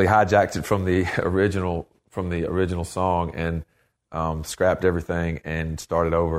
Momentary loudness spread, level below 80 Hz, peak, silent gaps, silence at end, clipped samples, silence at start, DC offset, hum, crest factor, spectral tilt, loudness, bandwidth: 8 LU; -40 dBFS; -4 dBFS; none; 0 s; under 0.1%; 0 s; under 0.1%; none; 20 dB; -6.5 dB/octave; -24 LUFS; 15 kHz